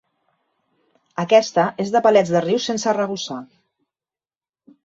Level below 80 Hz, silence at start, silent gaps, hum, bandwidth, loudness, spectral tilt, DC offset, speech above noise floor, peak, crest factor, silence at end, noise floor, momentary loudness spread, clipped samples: -66 dBFS; 1.2 s; none; none; 7.8 kHz; -19 LUFS; -4.5 dB/octave; under 0.1%; over 72 dB; -2 dBFS; 18 dB; 1.4 s; under -90 dBFS; 14 LU; under 0.1%